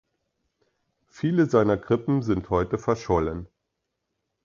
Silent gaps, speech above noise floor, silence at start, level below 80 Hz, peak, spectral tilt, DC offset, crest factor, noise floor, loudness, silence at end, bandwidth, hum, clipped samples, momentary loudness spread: none; 57 dB; 1.15 s; -46 dBFS; -6 dBFS; -8 dB/octave; under 0.1%; 20 dB; -80 dBFS; -24 LUFS; 1 s; 7.4 kHz; none; under 0.1%; 8 LU